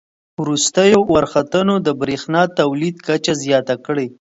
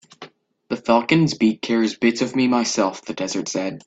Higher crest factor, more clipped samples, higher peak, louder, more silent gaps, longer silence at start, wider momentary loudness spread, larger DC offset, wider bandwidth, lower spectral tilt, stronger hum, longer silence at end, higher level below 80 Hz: about the same, 16 dB vs 18 dB; neither; about the same, 0 dBFS vs -2 dBFS; first, -16 LUFS vs -20 LUFS; neither; first, 0.4 s vs 0.2 s; about the same, 9 LU vs 9 LU; neither; about the same, 8 kHz vs 8.4 kHz; about the same, -4.5 dB/octave vs -4.5 dB/octave; neither; first, 0.2 s vs 0.05 s; first, -50 dBFS vs -60 dBFS